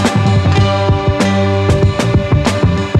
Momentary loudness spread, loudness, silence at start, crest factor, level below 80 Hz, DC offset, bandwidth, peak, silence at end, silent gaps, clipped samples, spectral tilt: 2 LU; -13 LUFS; 0 s; 12 dB; -26 dBFS; under 0.1%; 11.5 kHz; 0 dBFS; 0 s; none; under 0.1%; -6.5 dB/octave